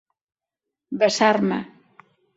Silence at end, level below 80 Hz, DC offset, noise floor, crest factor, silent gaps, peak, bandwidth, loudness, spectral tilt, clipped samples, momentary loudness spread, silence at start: 0.7 s; -66 dBFS; under 0.1%; -86 dBFS; 22 dB; none; -4 dBFS; 8 kHz; -20 LUFS; -4.5 dB/octave; under 0.1%; 17 LU; 0.9 s